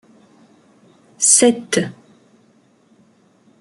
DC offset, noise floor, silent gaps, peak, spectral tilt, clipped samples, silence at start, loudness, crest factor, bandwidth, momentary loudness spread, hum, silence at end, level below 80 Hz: under 0.1%; -55 dBFS; none; 0 dBFS; -2.5 dB/octave; under 0.1%; 1.2 s; -14 LUFS; 22 dB; 12 kHz; 11 LU; none; 1.7 s; -66 dBFS